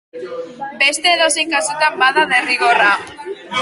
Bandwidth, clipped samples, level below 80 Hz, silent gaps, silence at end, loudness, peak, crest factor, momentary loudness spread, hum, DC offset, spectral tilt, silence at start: 12 kHz; under 0.1%; -62 dBFS; none; 0 s; -14 LUFS; 0 dBFS; 16 dB; 17 LU; none; under 0.1%; -0.5 dB/octave; 0.15 s